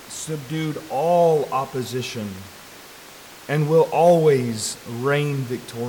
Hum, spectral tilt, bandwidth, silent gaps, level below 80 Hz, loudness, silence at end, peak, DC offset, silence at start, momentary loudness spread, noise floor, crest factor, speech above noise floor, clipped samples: none; -5.5 dB/octave; 19 kHz; none; -62 dBFS; -21 LUFS; 0 s; -6 dBFS; under 0.1%; 0 s; 24 LU; -43 dBFS; 16 dB; 22 dB; under 0.1%